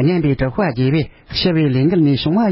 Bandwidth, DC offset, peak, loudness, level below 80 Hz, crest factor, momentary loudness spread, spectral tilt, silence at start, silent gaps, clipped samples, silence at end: 5.8 kHz; under 0.1%; -4 dBFS; -16 LUFS; -38 dBFS; 12 dB; 5 LU; -11.5 dB/octave; 0 s; none; under 0.1%; 0 s